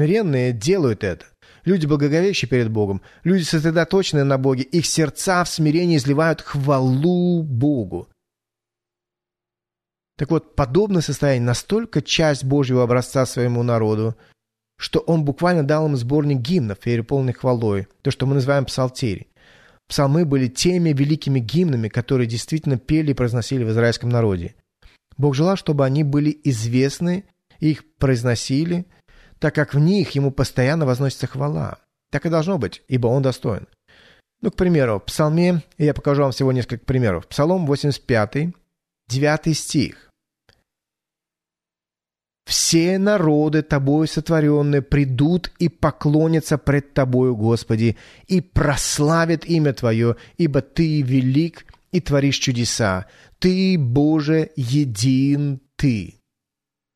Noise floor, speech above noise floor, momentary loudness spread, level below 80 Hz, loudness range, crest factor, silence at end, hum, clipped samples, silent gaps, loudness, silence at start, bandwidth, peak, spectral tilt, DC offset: under -90 dBFS; over 71 dB; 6 LU; -42 dBFS; 4 LU; 14 dB; 0.9 s; none; under 0.1%; none; -19 LUFS; 0 s; 13.5 kHz; -4 dBFS; -6 dB/octave; under 0.1%